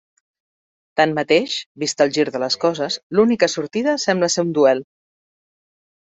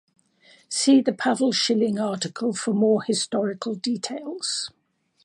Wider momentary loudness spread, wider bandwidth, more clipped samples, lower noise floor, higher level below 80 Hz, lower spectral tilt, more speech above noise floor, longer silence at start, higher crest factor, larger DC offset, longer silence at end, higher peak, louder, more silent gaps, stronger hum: about the same, 8 LU vs 10 LU; second, 8.2 kHz vs 11.5 kHz; neither; first, under -90 dBFS vs -57 dBFS; first, -64 dBFS vs -74 dBFS; about the same, -4 dB/octave vs -4 dB/octave; first, over 72 dB vs 34 dB; first, 0.95 s vs 0.7 s; about the same, 18 dB vs 18 dB; neither; first, 1.2 s vs 0.55 s; first, -2 dBFS vs -6 dBFS; first, -19 LUFS vs -23 LUFS; first, 1.66-1.75 s, 3.03-3.10 s vs none; neither